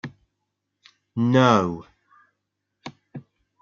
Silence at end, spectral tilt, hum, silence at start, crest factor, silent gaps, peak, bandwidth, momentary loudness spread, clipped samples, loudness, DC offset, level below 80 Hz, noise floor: 0.4 s; -6.5 dB/octave; 50 Hz at -55 dBFS; 0.05 s; 22 dB; none; -4 dBFS; 7.2 kHz; 26 LU; under 0.1%; -20 LUFS; under 0.1%; -64 dBFS; -79 dBFS